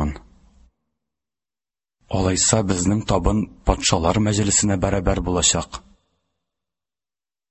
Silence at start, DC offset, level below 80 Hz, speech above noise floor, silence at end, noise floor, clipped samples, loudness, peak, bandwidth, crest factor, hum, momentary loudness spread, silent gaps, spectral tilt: 0 s; under 0.1%; -32 dBFS; over 71 dB; 1.7 s; under -90 dBFS; under 0.1%; -19 LUFS; -2 dBFS; 8.6 kHz; 20 dB; none; 10 LU; none; -4 dB/octave